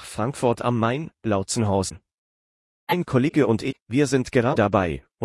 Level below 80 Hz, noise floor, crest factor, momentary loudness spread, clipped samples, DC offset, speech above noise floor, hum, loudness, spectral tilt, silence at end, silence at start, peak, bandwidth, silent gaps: -52 dBFS; under -90 dBFS; 18 dB; 8 LU; under 0.1%; under 0.1%; over 68 dB; none; -23 LUFS; -6 dB/octave; 0 s; 0 s; -6 dBFS; 12 kHz; 2.14-2.87 s, 3.82-3.86 s